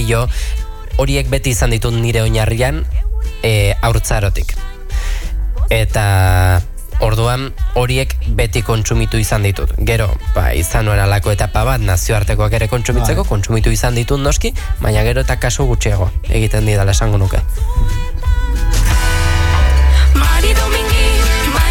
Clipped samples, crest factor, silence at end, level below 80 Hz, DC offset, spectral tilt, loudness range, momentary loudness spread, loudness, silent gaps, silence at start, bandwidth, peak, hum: under 0.1%; 12 dB; 0 s; -16 dBFS; under 0.1%; -5 dB/octave; 2 LU; 7 LU; -15 LUFS; none; 0 s; 18.5 kHz; 0 dBFS; none